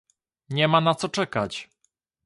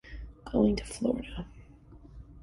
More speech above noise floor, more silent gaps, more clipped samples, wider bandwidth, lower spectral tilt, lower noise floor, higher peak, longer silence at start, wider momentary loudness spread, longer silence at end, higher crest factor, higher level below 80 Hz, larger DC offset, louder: first, 49 dB vs 23 dB; neither; neither; about the same, 11.5 kHz vs 11.5 kHz; second, -5 dB/octave vs -6.5 dB/octave; first, -72 dBFS vs -52 dBFS; first, -6 dBFS vs -12 dBFS; first, 0.5 s vs 0.05 s; second, 12 LU vs 22 LU; first, 0.6 s vs 0 s; about the same, 20 dB vs 20 dB; second, -62 dBFS vs -46 dBFS; neither; first, -24 LUFS vs -30 LUFS